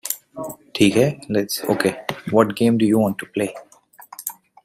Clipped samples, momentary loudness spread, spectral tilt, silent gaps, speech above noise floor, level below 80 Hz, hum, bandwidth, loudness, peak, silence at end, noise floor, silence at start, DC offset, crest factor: under 0.1%; 15 LU; -5 dB/octave; none; 27 dB; -58 dBFS; none; 16 kHz; -20 LUFS; -2 dBFS; 0.35 s; -45 dBFS; 0.05 s; under 0.1%; 20 dB